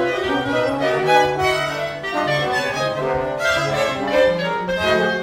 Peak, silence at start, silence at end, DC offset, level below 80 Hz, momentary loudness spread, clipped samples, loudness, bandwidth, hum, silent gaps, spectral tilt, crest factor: -2 dBFS; 0 s; 0 s; under 0.1%; -46 dBFS; 6 LU; under 0.1%; -19 LUFS; 16 kHz; none; none; -4.5 dB/octave; 16 dB